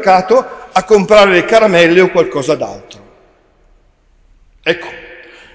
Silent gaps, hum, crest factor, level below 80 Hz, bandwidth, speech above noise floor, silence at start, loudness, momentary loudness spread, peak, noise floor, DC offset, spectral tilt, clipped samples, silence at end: none; none; 12 dB; -46 dBFS; 8 kHz; 40 dB; 0 s; -10 LUFS; 15 LU; 0 dBFS; -50 dBFS; under 0.1%; -5 dB/octave; 0.2%; 0.4 s